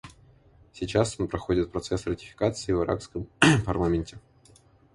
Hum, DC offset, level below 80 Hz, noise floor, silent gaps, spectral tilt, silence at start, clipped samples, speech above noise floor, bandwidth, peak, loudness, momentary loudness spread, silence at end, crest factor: none; under 0.1%; -44 dBFS; -57 dBFS; none; -5.5 dB/octave; 0.05 s; under 0.1%; 31 dB; 11.5 kHz; 0 dBFS; -26 LUFS; 12 LU; 0.75 s; 26 dB